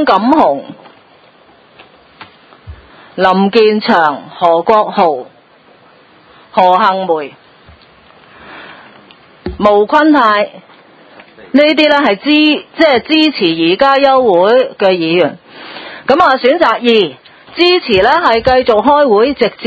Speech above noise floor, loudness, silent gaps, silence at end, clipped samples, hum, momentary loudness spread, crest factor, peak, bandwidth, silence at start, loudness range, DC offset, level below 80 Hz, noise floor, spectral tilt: 35 dB; -10 LUFS; none; 0 s; 0.4%; none; 13 LU; 12 dB; 0 dBFS; 8 kHz; 0 s; 7 LU; under 0.1%; -44 dBFS; -44 dBFS; -6.5 dB/octave